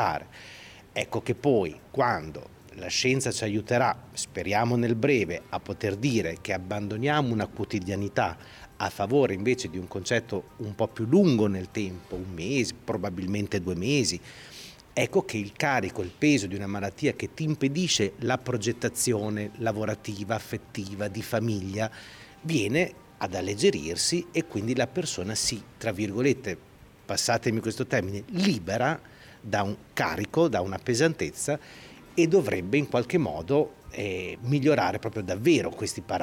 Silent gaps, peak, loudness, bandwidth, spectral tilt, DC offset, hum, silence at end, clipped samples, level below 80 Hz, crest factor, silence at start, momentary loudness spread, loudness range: none; -10 dBFS; -28 LUFS; over 20 kHz; -5 dB/octave; under 0.1%; none; 0 s; under 0.1%; -56 dBFS; 16 dB; 0 s; 11 LU; 3 LU